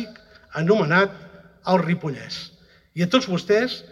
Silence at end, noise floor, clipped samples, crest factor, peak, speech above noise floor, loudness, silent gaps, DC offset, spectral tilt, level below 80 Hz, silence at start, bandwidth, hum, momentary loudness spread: 0.1 s; -45 dBFS; under 0.1%; 20 dB; -4 dBFS; 24 dB; -21 LUFS; none; under 0.1%; -6 dB/octave; -60 dBFS; 0 s; 11.5 kHz; none; 15 LU